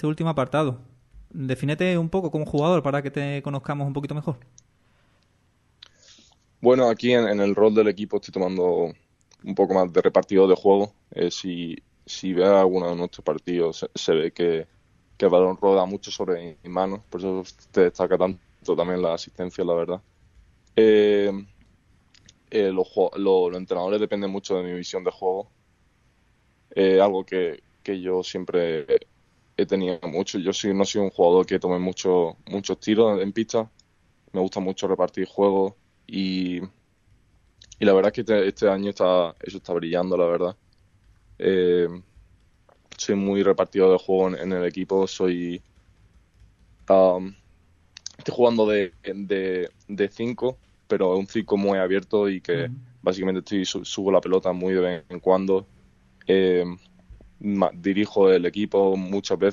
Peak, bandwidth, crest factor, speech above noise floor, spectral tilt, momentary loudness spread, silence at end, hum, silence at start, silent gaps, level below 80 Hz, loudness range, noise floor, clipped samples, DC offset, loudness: -4 dBFS; 7.4 kHz; 20 dB; 42 dB; -6 dB/octave; 12 LU; 0 s; none; 0 s; none; -58 dBFS; 4 LU; -64 dBFS; under 0.1%; under 0.1%; -23 LUFS